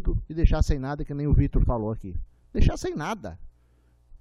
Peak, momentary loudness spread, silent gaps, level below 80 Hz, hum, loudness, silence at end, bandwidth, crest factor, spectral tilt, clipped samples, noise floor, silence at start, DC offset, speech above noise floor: -4 dBFS; 12 LU; none; -28 dBFS; none; -27 LUFS; 0.7 s; 10.5 kHz; 20 dB; -7.5 dB/octave; under 0.1%; -60 dBFS; 0 s; under 0.1%; 37 dB